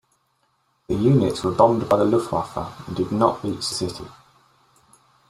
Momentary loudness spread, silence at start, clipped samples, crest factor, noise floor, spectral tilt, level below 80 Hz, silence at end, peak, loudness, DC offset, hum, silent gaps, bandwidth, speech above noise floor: 13 LU; 0.9 s; under 0.1%; 20 dB; -67 dBFS; -6.5 dB/octave; -52 dBFS; 1.2 s; -2 dBFS; -21 LUFS; under 0.1%; none; none; 15 kHz; 47 dB